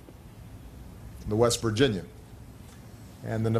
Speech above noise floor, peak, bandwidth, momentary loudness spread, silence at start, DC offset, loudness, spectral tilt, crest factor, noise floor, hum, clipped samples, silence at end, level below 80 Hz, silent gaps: 21 dB; -8 dBFS; 14.5 kHz; 23 LU; 0.1 s; under 0.1%; -27 LUFS; -5 dB/octave; 22 dB; -47 dBFS; none; under 0.1%; 0 s; -48 dBFS; none